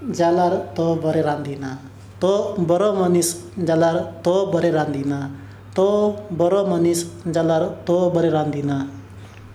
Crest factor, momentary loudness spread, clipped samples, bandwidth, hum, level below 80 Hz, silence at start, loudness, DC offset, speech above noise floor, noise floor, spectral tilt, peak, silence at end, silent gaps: 14 dB; 11 LU; under 0.1%; 15 kHz; none; -56 dBFS; 0 s; -20 LUFS; under 0.1%; 20 dB; -39 dBFS; -6 dB/octave; -6 dBFS; 0 s; none